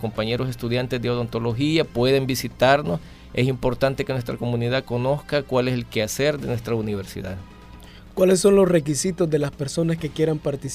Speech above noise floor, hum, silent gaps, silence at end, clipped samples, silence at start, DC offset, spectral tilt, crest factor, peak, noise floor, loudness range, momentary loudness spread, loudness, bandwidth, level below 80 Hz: 21 dB; none; none; 0 s; under 0.1%; 0 s; under 0.1%; -5.5 dB/octave; 18 dB; -4 dBFS; -43 dBFS; 3 LU; 9 LU; -22 LUFS; 15.5 kHz; -44 dBFS